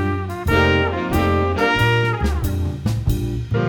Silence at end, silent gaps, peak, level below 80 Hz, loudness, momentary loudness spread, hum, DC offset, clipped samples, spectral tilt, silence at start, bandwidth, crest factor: 0 s; none; -2 dBFS; -28 dBFS; -19 LUFS; 7 LU; none; under 0.1%; under 0.1%; -6.5 dB/octave; 0 s; 19.5 kHz; 16 dB